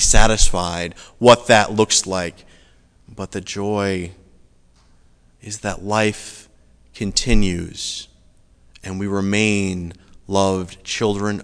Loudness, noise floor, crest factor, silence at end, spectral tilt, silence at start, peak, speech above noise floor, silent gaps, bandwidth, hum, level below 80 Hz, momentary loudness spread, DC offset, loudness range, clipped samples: -19 LUFS; -53 dBFS; 18 dB; 0 s; -3.5 dB/octave; 0 s; 0 dBFS; 35 dB; none; 11 kHz; none; -26 dBFS; 17 LU; under 0.1%; 9 LU; under 0.1%